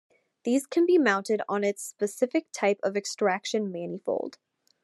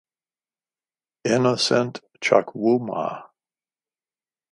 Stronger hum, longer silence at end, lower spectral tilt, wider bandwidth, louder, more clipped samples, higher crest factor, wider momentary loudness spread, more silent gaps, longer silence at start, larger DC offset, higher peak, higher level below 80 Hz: neither; second, 0.55 s vs 1.25 s; about the same, -4.5 dB/octave vs -4.5 dB/octave; about the same, 12.5 kHz vs 11.5 kHz; second, -27 LUFS vs -22 LUFS; neither; about the same, 18 dB vs 22 dB; about the same, 10 LU vs 11 LU; neither; second, 0.45 s vs 1.25 s; neither; second, -8 dBFS vs -2 dBFS; second, -88 dBFS vs -70 dBFS